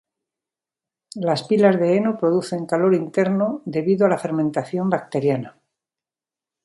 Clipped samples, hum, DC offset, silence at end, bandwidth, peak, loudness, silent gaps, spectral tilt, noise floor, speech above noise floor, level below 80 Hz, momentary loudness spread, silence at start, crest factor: under 0.1%; none; under 0.1%; 1.15 s; 11.5 kHz; -2 dBFS; -20 LUFS; none; -7.5 dB/octave; under -90 dBFS; over 70 dB; -68 dBFS; 7 LU; 1.15 s; 20 dB